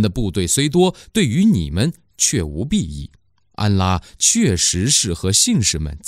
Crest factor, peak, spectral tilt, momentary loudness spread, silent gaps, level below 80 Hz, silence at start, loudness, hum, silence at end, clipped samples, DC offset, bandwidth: 14 dB; -2 dBFS; -4 dB/octave; 8 LU; none; -36 dBFS; 0 s; -17 LUFS; none; 0 s; under 0.1%; under 0.1%; 16 kHz